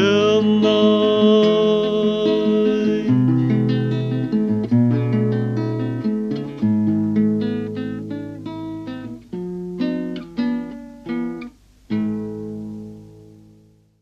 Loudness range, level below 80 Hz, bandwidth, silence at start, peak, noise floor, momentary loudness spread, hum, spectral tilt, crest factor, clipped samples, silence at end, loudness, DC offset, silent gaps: 11 LU; -54 dBFS; 6.8 kHz; 0 s; -4 dBFS; -52 dBFS; 16 LU; none; -8 dB/octave; 16 dB; under 0.1%; 0.8 s; -19 LUFS; under 0.1%; none